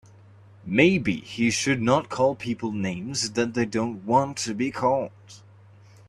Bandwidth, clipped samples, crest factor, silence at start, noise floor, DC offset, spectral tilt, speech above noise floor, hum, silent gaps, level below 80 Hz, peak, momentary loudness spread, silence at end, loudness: 13 kHz; under 0.1%; 22 dB; 0.65 s; -51 dBFS; under 0.1%; -4.5 dB/octave; 27 dB; none; none; -58 dBFS; -4 dBFS; 9 LU; 0.7 s; -24 LUFS